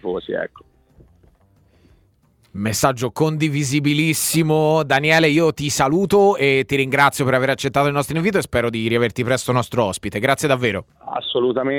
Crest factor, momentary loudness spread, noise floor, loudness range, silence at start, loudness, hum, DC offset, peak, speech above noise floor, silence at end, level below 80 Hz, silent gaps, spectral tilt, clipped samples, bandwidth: 18 dB; 9 LU; -58 dBFS; 7 LU; 0.05 s; -18 LUFS; none; under 0.1%; 0 dBFS; 40 dB; 0 s; -48 dBFS; none; -4.5 dB/octave; under 0.1%; 19 kHz